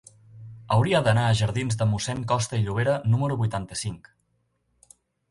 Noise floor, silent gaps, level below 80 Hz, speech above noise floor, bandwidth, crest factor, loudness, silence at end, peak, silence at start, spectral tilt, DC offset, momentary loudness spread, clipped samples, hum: -71 dBFS; none; -50 dBFS; 48 dB; 11.5 kHz; 18 dB; -24 LUFS; 1.35 s; -8 dBFS; 0.35 s; -5.5 dB/octave; under 0.1%; 12 LU; under 0.1%; none